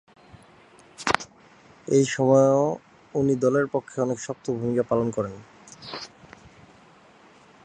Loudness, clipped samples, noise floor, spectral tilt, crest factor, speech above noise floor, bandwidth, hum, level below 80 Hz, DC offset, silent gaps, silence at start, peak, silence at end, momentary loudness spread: -24 LUFS; under 0.1%; -53 dBFS; -5.5 dB/octave; 26 dB; 31 dB; 11 kHz; none; -60 dBFS; under 0.1%; none; 1 s; 0 dBFS; 1.6 s; 19 LU